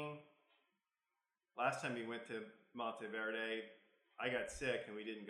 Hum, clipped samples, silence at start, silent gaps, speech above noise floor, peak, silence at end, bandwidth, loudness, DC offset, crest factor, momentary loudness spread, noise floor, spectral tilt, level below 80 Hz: none; under 0.1%; 0 s; none; over 46 dB; -24 dBFS; 0 s; 13 kHz; -44 LUFS; under 0.1%; 22 dB; 15 LU; under -90 dBFS; -4 dB/octave; -72 dBFS